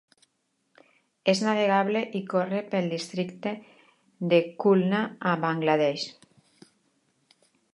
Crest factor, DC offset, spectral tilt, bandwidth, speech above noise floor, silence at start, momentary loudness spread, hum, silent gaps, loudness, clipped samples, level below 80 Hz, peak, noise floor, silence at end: 20 dB; under 0.1%; -6 dB/octave; 11.5 kHz; 50 dB; 1.25 s; 11 LU; none; none; -26 LUFS; under 0.1%; -80 dBFS; -8 dBFS; -75 dBFS; 1.6 s